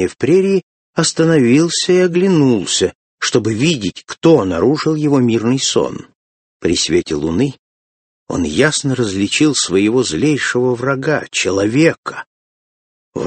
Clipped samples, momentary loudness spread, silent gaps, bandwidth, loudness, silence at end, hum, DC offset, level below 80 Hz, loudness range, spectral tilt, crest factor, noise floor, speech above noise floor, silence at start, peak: under 0.1%; 8 LU; 0.63-0.93 s, 2.95-3.18 s, 6.15-6.60 s, 7.59-8.26 s, 11.98-12.03 s, 12.26-13.12 s; 8.8 kHz; -15 LUFS; 0 s; none; under 0.1%; -46 dBFS; 4 LU; -4.5 dB/octave; 16 dB; under -90 dBFS; over 76 dB; 0 s; 0 dBFS